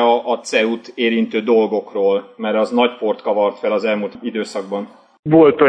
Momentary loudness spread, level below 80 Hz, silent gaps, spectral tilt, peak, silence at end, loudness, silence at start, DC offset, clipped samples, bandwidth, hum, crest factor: 9 LU; -62 dBFS; 5.19-5.23 s; -5.5 dB/octave; 0 dBFS; 0 s; -18 LUFS; 0 s; under 0.1%; under 0.1%; 9.8 kHz; none; 16 dB